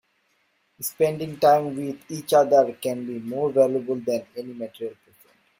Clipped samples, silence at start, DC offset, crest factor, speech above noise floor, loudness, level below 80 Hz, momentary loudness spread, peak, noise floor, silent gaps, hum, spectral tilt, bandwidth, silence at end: under 0.1%; 0.8 s; under 0.1%; 18 dB; 45 dB; -23 LUFS; -68 dBFS; 15 LU; -6 dBFS; -68 dBFS; none; none; -5.5 dB/octave; 16.5 kHz; 0.65 s